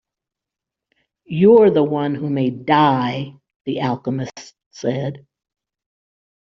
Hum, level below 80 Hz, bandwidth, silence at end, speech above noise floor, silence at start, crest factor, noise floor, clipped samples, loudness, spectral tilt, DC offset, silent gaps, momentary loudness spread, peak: none; -60 dBFS; 7.4 kHz; 1.3 s; 69 dB; 1.3 s; 18 dB; -86 dBFS; under 0.1%; -18 LUFS; -6 dB/octave; under 0.1%; 3.56-3.65 s, 4.66-4.71 s; 17 LU; -2 dBFS